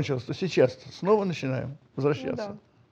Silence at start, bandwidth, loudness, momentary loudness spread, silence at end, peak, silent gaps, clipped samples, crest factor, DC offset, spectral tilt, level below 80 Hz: 0 s; 8 kHz; -28 LUFS; 12 LU; 0.3 s; -8 dBFS; none; under 0.1%; 20 dB; under 0.1%; -7 dB/octave; -64 dBFS